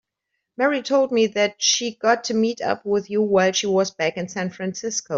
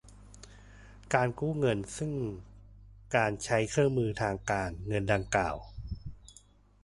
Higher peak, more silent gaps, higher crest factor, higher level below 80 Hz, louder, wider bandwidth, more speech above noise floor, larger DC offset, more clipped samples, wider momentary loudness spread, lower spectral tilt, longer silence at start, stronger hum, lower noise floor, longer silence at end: first, -4 dBFS vs -10 dBFS; neither; about the same, 18 dB vs 22 dB; second, -66 dBFS vs -50 dBFS; first, -21 LUFS vs -31 LUFS; second, 7.8 kHz vs 11.5 kHz; first, 58 dB vs 29 dB; neither; neither; second, 8 LU vs 19 LU; second, -3 dB/octave vs -5.5 dB/octave; first, 0.6 s vs 0.05 s; second, none vs 50 Hz at -50 dBFS; first, -79 dBFS vs -60 dBFS; second, 0 s vs 0.5 s